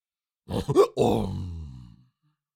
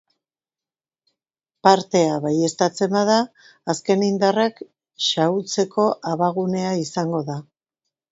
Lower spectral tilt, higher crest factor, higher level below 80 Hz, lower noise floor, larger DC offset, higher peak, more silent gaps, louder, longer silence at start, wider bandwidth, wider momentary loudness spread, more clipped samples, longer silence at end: first, -7 dB/octave vs -5 dB/octave; about the same, 20 dB vs 22 dB; first, -46 dBFS vs -68 dBFS; second, -71 dBFS vs under -90 dBFS; neither; second, -8 dBFS vs 0 dBFS; neither; second, -25 LUFS vs -20 LUFS; second, 0.5 s vs 1.65 s; first, 16.5 kHz vs 8 kHz; first, 18 LU vs 8 LU; neither; about the same, 0.7 s vs 0.7 s